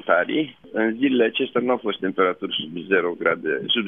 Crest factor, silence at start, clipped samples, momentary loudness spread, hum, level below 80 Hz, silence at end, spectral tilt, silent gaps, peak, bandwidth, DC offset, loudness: 20 dB; 0.05 s; under 0.1%; 6 LU; none; -70 dBFS; 0 s; -8 dB/octave; none; -2 dBFS; 3.8 kHz; under 0.1%; -22 LUFS